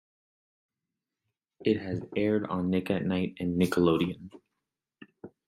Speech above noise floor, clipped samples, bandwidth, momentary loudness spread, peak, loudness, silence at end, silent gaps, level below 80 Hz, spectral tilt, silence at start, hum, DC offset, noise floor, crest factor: 60 dB; under 0.1%; 15.5 kHz; 8 LU; -10 dBFS; -29 LUFS; 0.2 s; none; -66 dBFS; -7.5 dB/octave; 1.6 s; none; under 0.1%; -88 dBFS; 20 dB